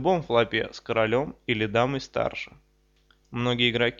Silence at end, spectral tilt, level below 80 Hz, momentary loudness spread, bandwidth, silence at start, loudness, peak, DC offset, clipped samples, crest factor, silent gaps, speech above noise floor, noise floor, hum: 0.05 s; -6 dB/octave; -54 dBFS; 8 LU; 7.4 kHz; 0 s; -25 LUFS; -8 dBFS; under 0.1%; under 0.1%; 18 dB; none; 38 dB; -63 dBFS; none